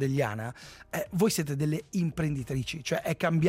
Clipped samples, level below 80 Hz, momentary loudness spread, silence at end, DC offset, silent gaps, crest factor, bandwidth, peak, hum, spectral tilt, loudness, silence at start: under 0.1%; -54 dBFS; 10 LU; 0 s; under 0.1%; none; 16 dB; 16 kHz; -14 dBFS; none; -5.5 dB/octave; -30 LUFS; 0 s